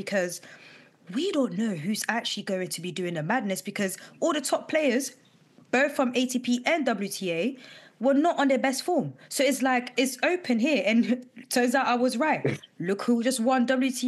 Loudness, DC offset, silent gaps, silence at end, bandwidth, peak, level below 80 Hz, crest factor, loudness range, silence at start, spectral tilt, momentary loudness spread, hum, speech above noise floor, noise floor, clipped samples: -26 LUFS; under 0.1%; none; 0 s; 12.5 kHz; -10 dBFS; under -90 dBFS; 18 dB; 4 LU; 0 s; -4 dB/octave; 8 LU; none; 31 dB; -58 dBFS; under 0.1%